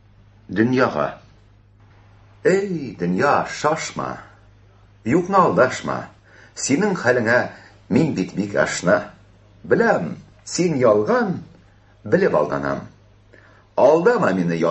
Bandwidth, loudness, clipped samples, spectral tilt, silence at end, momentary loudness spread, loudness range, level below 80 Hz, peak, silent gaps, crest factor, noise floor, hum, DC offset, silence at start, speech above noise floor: 8.6 kHz; -20 LUFS; under 0.1%; -5.5 dB/octave; 0 s; 14 LU; 3 LU; -54 dBFS; -2 dBFS; none; 18 dB; -51 dBFS; none; under 0.1%; 0.5 s; 32 dB